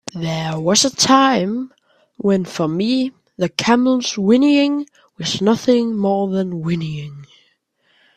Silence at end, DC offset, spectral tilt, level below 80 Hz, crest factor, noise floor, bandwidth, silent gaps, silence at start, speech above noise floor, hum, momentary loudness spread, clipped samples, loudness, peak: 0.9 s; under 0.1%; -4.5 dB/octave; -58 dBFS; 18 dB; -62 dBFS; 14.5 kHz; none; 0.15 s; 45 dB; none; 13 LU; under 0.1%; -17 LUFS; 0 dBFS